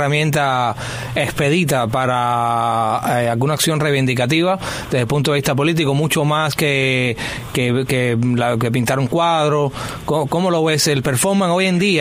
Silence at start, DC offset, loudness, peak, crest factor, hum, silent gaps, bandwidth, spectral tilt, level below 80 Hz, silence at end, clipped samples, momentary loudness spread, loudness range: 0 s; under 0.1%; -17 LUFS; 0 dBFS; 16 dB; none; none; 16 kHz; -5 dB/octave; -44 dBFS; 0 s; under 0.1%; 5 LU; 1 LU